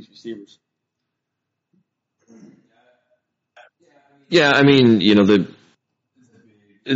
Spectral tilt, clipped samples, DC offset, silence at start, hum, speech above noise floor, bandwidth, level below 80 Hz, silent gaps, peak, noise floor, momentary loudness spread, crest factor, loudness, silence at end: -4 dB/octave; under 0.1%; under 0.1%; 0.25 s; none; 64 dB; 7.8 kHz; -60 dBFS; none; 0 dBFS; -80 dBFS; 23 LU; 20 dB; -14 LUFS; 0 s